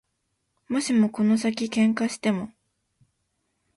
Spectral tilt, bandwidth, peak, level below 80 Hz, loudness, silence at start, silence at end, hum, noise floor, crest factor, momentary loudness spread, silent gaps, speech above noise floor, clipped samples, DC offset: -5 dB/octave; 11.5 kHz; -10 dBFS; -68 dBFS; -24 LUFS; 0.7 s; 1.3 s; none; -76 dBFS; 16 dB; 8 LU; none; 53 dB; under 0.1%; under 0.1%